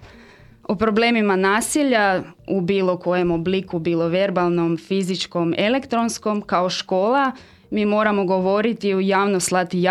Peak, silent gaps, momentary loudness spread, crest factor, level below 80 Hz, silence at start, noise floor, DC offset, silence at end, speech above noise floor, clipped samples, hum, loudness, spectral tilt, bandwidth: -4 dBFS; none; 6 LU; 16 dB; -54 dBFS; 0 s; -47 dBFS; under 0.1%; 0 s; 27 dB; under 0.1%; none; -20 LUFS; -5 dB/octave; 14.5 kHz